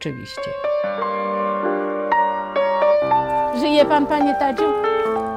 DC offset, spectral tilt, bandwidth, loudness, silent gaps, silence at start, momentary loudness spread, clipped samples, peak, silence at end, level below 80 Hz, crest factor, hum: under 0.1%; -5.5 dB/octave; 11.5 kHz; -19 LUFS; none; 0 s; 7 LU; under 0.1%; -4 dBFS; 0 s; -52 dBFS; 16 dB; none